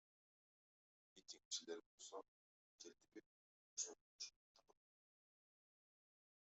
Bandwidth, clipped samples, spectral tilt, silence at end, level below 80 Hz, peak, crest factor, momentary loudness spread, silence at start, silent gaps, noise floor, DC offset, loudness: 8 kHz; under 0.1%; 0.5 dB/octave; 1.95 s; under -90 dBFS; -34 dBFS; 26 dB; 16 LU; 1.15 s; 1.45-1.51 s, 1.86-1.98 s, 2.28-2.78 s, 3.26-3.77 s, 4.01-4.19 s, 4.36-4.55 s; under -90 dBFS; under 0.1%; -54 LUFS